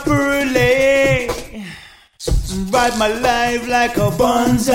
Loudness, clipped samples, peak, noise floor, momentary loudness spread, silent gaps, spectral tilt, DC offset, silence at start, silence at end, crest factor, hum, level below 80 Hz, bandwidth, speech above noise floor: -16 LUFS; under 0.1%; -2 dBFS; -40 dBFS; 14 LU; none; -4.5 dB/octave; under 0.1%; 0 s; 0 s; 14 dB; none; -30 dBFS; 16.5 kHz; 25 dB